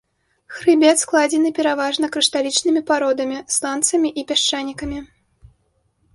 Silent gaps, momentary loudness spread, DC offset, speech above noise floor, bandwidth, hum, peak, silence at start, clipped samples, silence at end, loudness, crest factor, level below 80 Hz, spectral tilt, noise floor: none; 11 LU; under 0.1%; 47 dB; 11.5 kHz; none; -2 dBFS; 0.5 s; under 0.1%; 1.1 s; -18 LUFS; 18 dB; -50 dBFS; -1.5 dB/octave; -65 dBFS